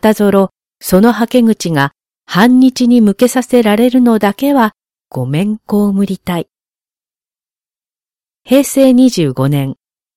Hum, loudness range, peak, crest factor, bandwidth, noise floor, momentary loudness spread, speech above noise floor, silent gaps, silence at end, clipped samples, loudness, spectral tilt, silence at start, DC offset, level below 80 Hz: none; 8 LU; 0 dBFS; 12 dB; 16.5 kHz; under -90 dBFS; 10 LU; over 80 dB; none; 0.45 s; under 0.1%; -11 LUFS; -6 dB/octave; 0.05 s; under 0.1%; -46 dBFS